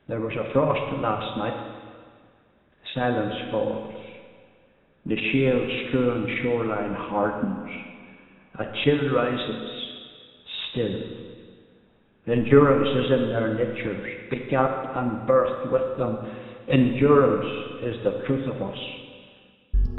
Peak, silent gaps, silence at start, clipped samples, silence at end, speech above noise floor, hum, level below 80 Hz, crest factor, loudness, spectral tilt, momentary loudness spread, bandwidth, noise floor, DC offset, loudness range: -2 dBFS; none; 0.1 s; under 0.1%; 0 s; 37 dB; none; -40 dBFS; 22 dB; -25 LUFS; -9.5 dB/octave; 18 LU; 4.2 kHz; -60 dBFS; under 0.1%; 7 LU